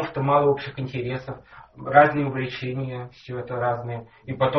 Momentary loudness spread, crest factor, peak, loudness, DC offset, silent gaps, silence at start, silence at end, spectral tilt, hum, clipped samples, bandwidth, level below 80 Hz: 19 LU; 22 dB; -2 dBFS; -23 LUFS; under 0.1%; none; 0 s; 0 s; -5 dB/octave; none; under 0.1%; 6.2 kHz; -56 dBFS